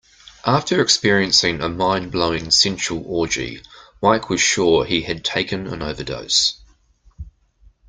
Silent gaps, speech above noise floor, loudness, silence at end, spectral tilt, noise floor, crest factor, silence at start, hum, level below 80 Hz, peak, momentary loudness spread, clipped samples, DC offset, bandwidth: none; 35 dB; -18 LUFS; 0.6 s; -3 dB/octave; -54 dBFS; 20 dB; 0.25 s; none; -44 dBFS; 0 dBFS; 12 LU; under 0.1%; under 0.1%; 10 kHz